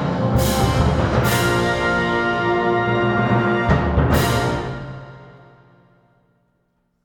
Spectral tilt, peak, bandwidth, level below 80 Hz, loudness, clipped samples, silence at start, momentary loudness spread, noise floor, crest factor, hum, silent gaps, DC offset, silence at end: -6 dB/octave; -4 dBFS; 19 kHz; -30 dBFS; -18 LUFS; under 0.1%; 0 s; 6 LU; -67 dBFS; 16 dB; none; none; under 0.1%; 1.75 s